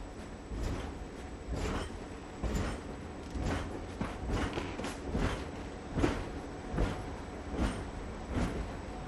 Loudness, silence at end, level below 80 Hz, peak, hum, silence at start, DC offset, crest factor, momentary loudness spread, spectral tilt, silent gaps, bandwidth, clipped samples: -38 LUFS; 0 s; -42 dBFS; -16 dBFS; none; 0 s; under 0.1%; 22 dB; 9 LU; -6 dB/octave; none; 13 kHz; under 0.1%